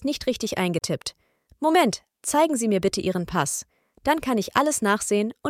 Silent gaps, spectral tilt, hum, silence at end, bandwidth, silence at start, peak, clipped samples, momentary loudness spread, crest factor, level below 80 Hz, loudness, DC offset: none; -4 dB/octave; none; 0 s; 16.5 kHz; 0 s; -4 dBFS; under 0.1%; 8 LU; 20 dB; -54 dBFS; -24 LUFS; under 0.1%